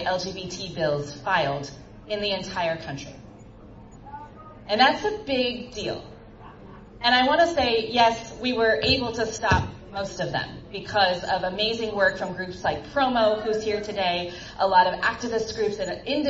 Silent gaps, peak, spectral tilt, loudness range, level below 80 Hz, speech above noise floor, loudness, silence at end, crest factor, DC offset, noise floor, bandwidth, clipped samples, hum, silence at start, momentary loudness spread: none; -4 dBFS; -4 dB/octave; 6 LU; -48 dBFS; 21 dB; -24 LUFS; 0 s; 20 dB; under 0.1%; -45 dBFS; 8 kHz; under 0.1%; none; 0 s; 15 LU